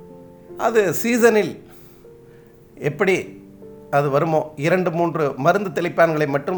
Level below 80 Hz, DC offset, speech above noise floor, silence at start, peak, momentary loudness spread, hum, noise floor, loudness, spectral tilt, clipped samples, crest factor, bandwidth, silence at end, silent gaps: -60 dBFS; under 0.1%; 28 dB; 0 s; -2 dBFS; 11 LU; none; -46 dBFS; -19 LUFS; -6 dB/octave; under 0.1%; 18 dB; over 20 kHz; 0 s; none